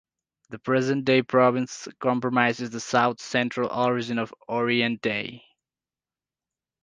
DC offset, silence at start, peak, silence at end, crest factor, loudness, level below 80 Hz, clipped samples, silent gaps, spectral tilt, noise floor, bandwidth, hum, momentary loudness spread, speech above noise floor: under 0.1%; 0.5 s; -4 dBFS; 1.45 s; 22 dB; -24 LUFS; -68 dBFS; under 0.1%; none; -5 dB/octave; under -90 dBFS; 9.6 kHz; none; 10 LU; over 66 dB